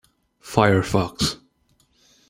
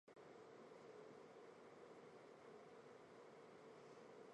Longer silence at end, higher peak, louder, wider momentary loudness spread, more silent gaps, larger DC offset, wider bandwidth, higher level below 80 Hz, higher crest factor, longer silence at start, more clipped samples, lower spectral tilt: first, 0.95 s vs 0 s; first, -2 dBFS vs -50 dBFS; first, -21 LUFS vs -63 LUFS; first, 7 LU vs 2 LU; neither; neither; first, 16 kHz vs 10.5 kHz; first, -48 dBFS vs under -90 dBFS; first, 22 dB vs 12 dB; first, 0.45 s vs 0.05 s; neither; about the same, -5 dB/octave vs -5 dB/octave